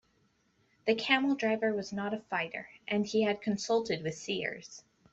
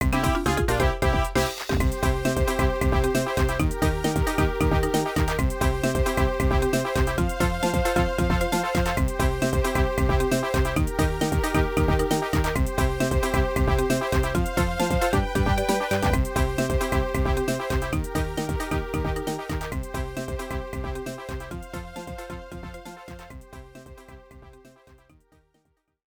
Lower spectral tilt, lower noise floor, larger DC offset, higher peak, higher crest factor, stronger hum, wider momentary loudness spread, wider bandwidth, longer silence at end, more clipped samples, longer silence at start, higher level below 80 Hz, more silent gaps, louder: about the same, -4.5 dB/octave vs -5.5 dB/octave; about the same, -72 dBFS vs -70 dBFS; neither; second, -12 dBFS vs -8 dBFS; first, 22 dB vs 16 dB; neither; about the same, 11 LU vs 12 LU; second, 8.2 kHz vs over 20 kHz; second, 0.35 s vs 1.45 s; neither; first, 0.85 s vs 0 s; second, -72 dBFS vs -30 dBFS; neither; second, -32 LUFS vs -24 LUFS